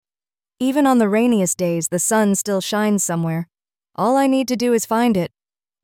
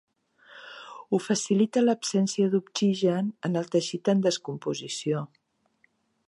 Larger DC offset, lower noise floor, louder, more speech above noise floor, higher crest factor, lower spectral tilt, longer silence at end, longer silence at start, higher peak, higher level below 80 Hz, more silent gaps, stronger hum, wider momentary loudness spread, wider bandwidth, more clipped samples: neither; first, under -90 dBFS vs -69 dBFS; first, -18 LUFS vs -26 LUFS; first, over 73 dB vs 43 dB; about the same, 14 dB vs 16 dB; about the same, -4.5 dB/octave vs -5.5 dB/octave; second, 0.55 s vs 1 s; about the same, 0.6 s vs 0.5 s; first, -4 dBFS vs -10 dBFS; first, -60 dBFS vs -78 dBFS; neither; neither; second, 8 LU vs 19 LU; first, 17 kHz vs 11.5 kHz; neither